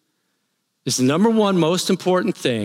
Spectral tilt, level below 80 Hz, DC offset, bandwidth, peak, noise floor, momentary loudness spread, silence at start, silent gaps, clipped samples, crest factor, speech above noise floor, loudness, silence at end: -5 dB/octave; -70 dBFS; under 0.1%; 16.5 kHz; -6 dBFS; -72 dBFS; 6 LU; 0.85 s; none; under 0.1%; 14 dB; 54 dB; -18 LUFS; 0 s